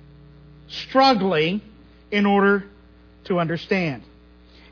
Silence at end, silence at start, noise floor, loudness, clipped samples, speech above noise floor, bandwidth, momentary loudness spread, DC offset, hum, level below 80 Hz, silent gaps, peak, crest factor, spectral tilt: 0.7 s; 0.7 s; -50 dBFS; -21 LUFS; under 0.1%; 30 dB; 5.4 kHz; 14 LU; under 0.1%; none; -52 dBFS; none; -6 dBFS; 18 dB; -6.5 dB/octave